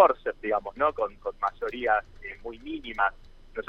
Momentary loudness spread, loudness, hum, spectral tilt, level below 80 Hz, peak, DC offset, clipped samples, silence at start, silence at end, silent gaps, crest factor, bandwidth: 13 LU; -29 LUFS; none; -6 dB/octave; -50 dBFS; -4 dBFS; under 0.1%; under 0.1%; 0 s; 0.05 s; none; 24 dB; 7 kHz